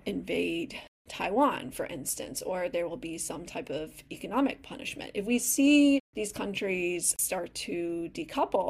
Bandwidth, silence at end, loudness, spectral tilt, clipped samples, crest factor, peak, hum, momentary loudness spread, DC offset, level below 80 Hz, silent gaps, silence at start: 16 kHz; 0 s; -30 LUFS; -3 dB/octave; under 0.1%; 18 dB; -14 dBFS; none; 13 LU; under 0.1%; -60 dBFS; 0.88-1.05 s, 6.00-6.13 s; 0.05 s